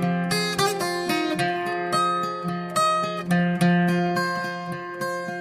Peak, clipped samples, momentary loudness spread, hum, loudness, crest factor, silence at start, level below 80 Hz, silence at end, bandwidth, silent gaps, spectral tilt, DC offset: -8 dBFS; under 0.1%; 8 LU; none; -24 LUFS; 14 dB; 0 s; -62 dBFS; 0 s; 15.5 kHz; none; -5 dB/octave; under 0.1%